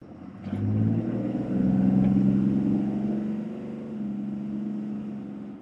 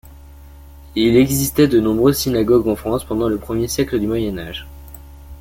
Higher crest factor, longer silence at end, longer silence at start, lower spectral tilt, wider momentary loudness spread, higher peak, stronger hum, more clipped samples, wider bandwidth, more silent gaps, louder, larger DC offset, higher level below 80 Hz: about the same, 16 dB vs 16 dB; about the same, 0 s vs 0 s; about the same, 0 s vs 0.05 s; first, -11 dB/octave vs -5.5 dB/octave; about the same, 14 LU vs 14 LU; second, -10 dBFS vs -2 dBFS; neither; neither; second, 3.8 kHz vs 17 kHz; neither; second, -27 LUFS vs -17 LUFS; neither; second, -52 dBFS vs -36 dBFS